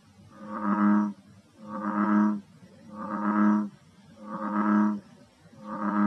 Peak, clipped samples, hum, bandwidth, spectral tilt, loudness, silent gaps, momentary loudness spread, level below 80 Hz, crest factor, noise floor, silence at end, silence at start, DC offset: -12 dBFS; under 0.1%; none; 6 kHz; -9 dB/octave; -27 LUFS; none; 19 LU; -78 dBFS; 16 dB; -54 dBFS; 0 s; 0.35 s; under 0.1%